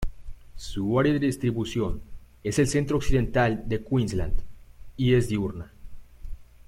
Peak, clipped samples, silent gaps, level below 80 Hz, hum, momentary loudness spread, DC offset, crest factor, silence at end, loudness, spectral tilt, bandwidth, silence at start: -8 dBFS; under 0.1%; none; -36 dBFS; 60 Hz at -45 dBFS; 19 LU; under 0.1%; 16 dB; 0.25 s; -26 LUFS; -6.5 dB/octave; 14.5 kHz; 0 s